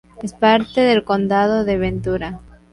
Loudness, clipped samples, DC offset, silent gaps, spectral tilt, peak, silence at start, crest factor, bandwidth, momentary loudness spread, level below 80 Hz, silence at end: -17 LUFS; under 0.1%; under 0.1%; none; -6.5 dB/octave; -4 dBFS; 0.15 s; 14 dB; 11.5 kHz; 14 LU; -40 dBFS; 0.35 s